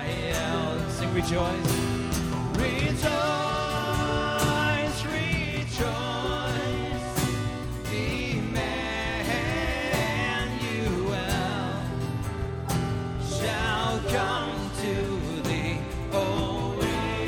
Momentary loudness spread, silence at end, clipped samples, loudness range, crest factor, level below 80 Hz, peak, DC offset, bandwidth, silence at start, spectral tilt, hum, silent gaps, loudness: 5 LU; 0 s; under 0.1%; 3 LU; 16 dB; -38 dBFS; -12 dBFS; under 0.1%; 19 kHz; 0 s; -5 dB/octave; none; none; -28 LUFS